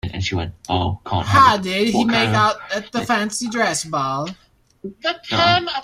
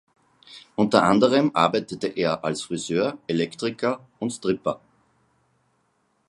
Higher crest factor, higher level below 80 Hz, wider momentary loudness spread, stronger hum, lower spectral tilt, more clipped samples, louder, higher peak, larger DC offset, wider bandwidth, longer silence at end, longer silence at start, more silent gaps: second, 18 dB vs 24 dB; first, -48 dBFS vs -62 dBFS; about the same, 12 LU vs 12 LU; neither; about the same, -4 dB/octave vs -5 dB/octave; neither; first, -19 LUFS vs -23 LUFS; about the same, -2 dBFS vs 0 dBFS; neither; first, 15.5 kHz vs 11.5 kHz; second, 0 s vs 1.5 s; second, 0.05 s vs 0.5 s; neither